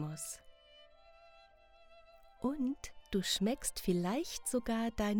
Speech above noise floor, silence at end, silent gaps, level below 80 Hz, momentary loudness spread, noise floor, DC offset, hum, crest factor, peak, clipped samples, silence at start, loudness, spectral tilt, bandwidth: 27 dB; 0 s; none; -56 dBFS; 10 LU; -62 dBFS; under 0.1%; none; 18 dB; -20 dBFS; under 0.1%; 0 s; -37 LUFS; -4.5 dB/octave; over 20 kHz